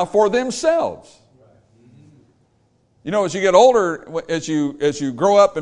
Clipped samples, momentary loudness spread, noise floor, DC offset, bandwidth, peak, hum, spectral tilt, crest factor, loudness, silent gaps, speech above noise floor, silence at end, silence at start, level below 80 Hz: under 0.1%; 13 LU; -61 dBFS; under 0.1%; 11 kHz; 0 dBFS; none; -4.5 dB/octave; 18 dB; -17 LUFS; none; 44 dB; 0 s; 0 s; -56 dBFS